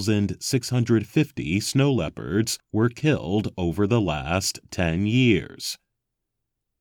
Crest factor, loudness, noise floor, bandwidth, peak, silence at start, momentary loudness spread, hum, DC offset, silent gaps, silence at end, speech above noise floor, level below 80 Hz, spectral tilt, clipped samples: 18 dB; -24 LUFS; -82 dBFS; 18 kHz; -6 dBFS; 0 s; 6 LU; none; under 0.1%; none; 1.05 s; 59 dB; -48 dBFS; -5.5 dB/octave; under 0.1%